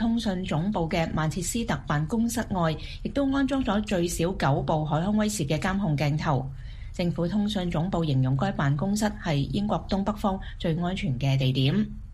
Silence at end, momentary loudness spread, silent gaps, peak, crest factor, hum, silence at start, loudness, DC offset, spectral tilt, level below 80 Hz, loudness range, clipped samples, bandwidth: 0 s; 4 LU; none; -10 dBFS; 16 dB; none; 0 s; -27 LUFS; under 0.1%; -6 dB/octave; -40 dBFS; 1 LU; under 0.1%; 15 kHz